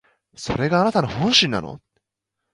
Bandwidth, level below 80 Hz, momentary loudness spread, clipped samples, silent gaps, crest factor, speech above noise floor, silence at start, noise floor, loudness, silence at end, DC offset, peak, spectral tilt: 11.5 kHz; -48 dBFS; 15 LU; under 0.1%; none; 20 dB; 61 dB; 0.4 s; -81 dBFS; -19 LUFS; 0.75 s; under 0.1%; -2 dBFS; -4.5 dB/octave